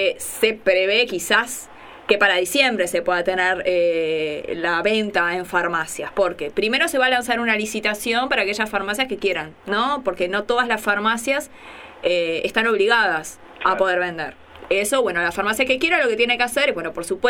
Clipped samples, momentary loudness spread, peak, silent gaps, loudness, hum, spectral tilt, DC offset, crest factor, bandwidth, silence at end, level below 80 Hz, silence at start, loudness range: under 0.1%; 9 LU; 0 dBFS; none; -20 LUFS; none; -2.5 dB/octave; under 0.1%; 20 dB; 19 kHz; 0 s; -54 dBFS; 0 s; 3 LU